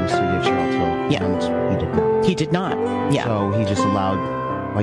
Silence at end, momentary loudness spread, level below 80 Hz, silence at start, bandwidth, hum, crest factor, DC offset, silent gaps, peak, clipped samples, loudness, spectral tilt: 0 s; 3 LU; -48 dBFS; 0 s; 11.5 kHz; none; 16 dB; under 0.1%; none; -4 dBFS; under 0.1%; -20 LUFS; -6.5 dB/octave